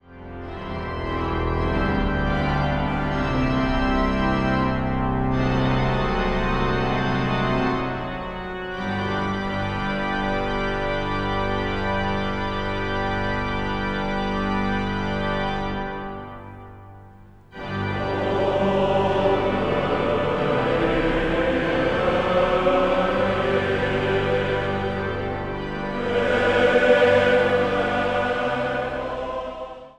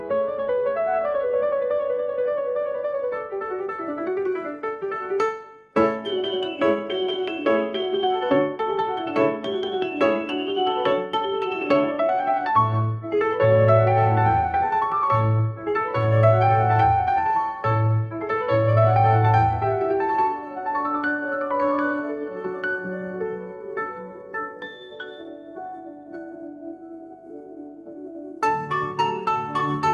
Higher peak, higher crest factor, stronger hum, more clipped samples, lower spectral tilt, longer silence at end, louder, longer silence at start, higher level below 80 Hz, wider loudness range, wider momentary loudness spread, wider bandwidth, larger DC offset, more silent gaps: about the same, -6 dBFS vs -4 dBFS; about the same, 18 dB vs 18 dB; neither; neither; about the same, -7 dB/octave vs -8 dB/octave; about the same, 0.05 s vs 0 s; about the same, -23 LUFS vs -23 LUFS; about the same, 0.1 s vs 0 s; first, -34 dBFS vs -50 dBFS; second, 6 LU vs 13 LU; second, 9 LU vs 19 LU; first, 9.8 kHz vs 7 kHz; neither; neither